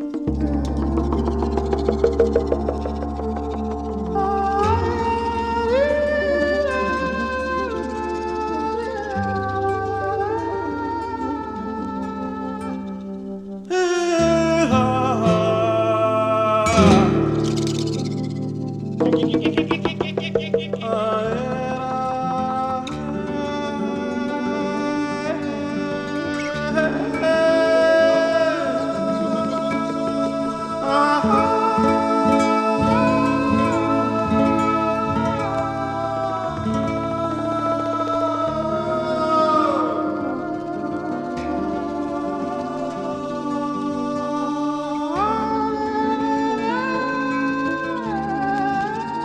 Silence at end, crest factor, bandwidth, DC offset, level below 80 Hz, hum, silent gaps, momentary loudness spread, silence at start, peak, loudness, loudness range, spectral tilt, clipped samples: 0 s; 18 dB; 11.5 kHz; under 0.1%; -38 dBFS; none; none; 9 LU; 0 s; -2 dBFS; -21 LUFS; 6 LU; -6.5 dB/octave; under 0.1%